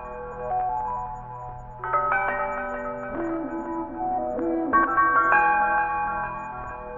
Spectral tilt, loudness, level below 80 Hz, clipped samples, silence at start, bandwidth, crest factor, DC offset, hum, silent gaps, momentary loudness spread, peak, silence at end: -8 dB/octave; -24 LUFS; -46 dBFS; under 0.1%; 0 s; 7.4 kHz; 18 dB; under 0.1%; none; none; 16 LU; -6 dBFS; 0 s